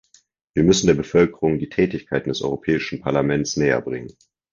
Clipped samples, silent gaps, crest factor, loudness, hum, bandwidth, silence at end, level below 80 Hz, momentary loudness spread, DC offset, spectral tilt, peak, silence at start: under 0.1%; none; 18 dB; -20 LUFS; none; 7.6 kHz; 0.4 s; -46 dBFS; 8 LU; under 0.1%; -5.5 dB/octave; -2 dBFS; 0.55 s